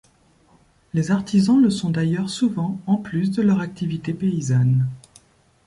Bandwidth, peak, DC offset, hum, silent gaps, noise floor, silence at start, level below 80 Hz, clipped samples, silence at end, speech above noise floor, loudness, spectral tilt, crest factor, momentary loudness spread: 11.5 kHz; -8 dBFS; under 0.1%; none; none; -57 dBFS; 0.95 s; -56 dBFS; under 0.1%; 0.7 s; 37 dB; -21 LUFS; -7 dB/octave; 14 dB; 9 LU